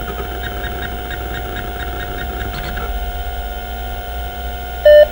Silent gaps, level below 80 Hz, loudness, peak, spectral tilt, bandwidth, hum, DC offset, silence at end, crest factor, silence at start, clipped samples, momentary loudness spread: none; -26 dBFS; -20 LUFS; 0 dBFS; -5 dB/octave; 16 kHz; none; under 0.1%; 0 s; 18 dB; 0 s; under 0.1%; 8 LU